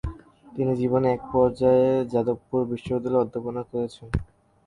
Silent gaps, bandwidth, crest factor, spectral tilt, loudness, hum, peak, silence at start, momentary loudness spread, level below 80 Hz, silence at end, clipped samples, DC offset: none; 10.5 kHz; 18 dB; -9 dB/octave; -24 LUFS; none; -6 dBFS; 0.05 s; 12 LU; -42 dBFS; 0.45 s; under 0.1%; under 0.1%